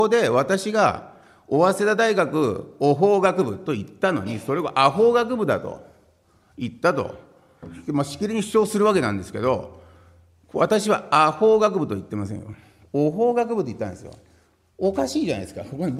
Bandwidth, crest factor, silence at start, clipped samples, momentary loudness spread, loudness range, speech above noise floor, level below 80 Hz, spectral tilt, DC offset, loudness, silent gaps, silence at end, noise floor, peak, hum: 14 kHz; 20 dB; 0 s; under 0.1%; 15 LU; 5 LU; 38 dB; -58 dBFS; -5.5 dB/octave; under 0.1%; -22 LUFS; none; 0 s; -59 dBFS; -2 dBFS; none